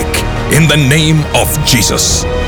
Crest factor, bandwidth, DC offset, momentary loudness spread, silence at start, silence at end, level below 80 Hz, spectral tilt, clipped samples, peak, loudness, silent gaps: 10 dB; over 20 kHz; under 0.1%; 4 LU; 0 s; 0 s; -22 dBFS; -4 dB/octave; under 0.1%; 0 dBFS; -9 LUFS; none